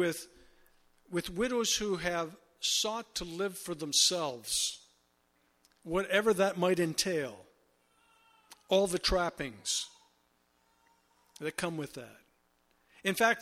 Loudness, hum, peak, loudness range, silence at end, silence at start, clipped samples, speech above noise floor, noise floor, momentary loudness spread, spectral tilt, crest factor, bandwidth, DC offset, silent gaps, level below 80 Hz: -31 LUFS; none; -12 dBFS; 7 LU; 0 s; 0 s; under 0.1%; 41 dB; -72 dBFS; 14 LU; -2.5 dB/octave; 22 dB; 16.5 kHz; under 0.1%; none; -56 dBFS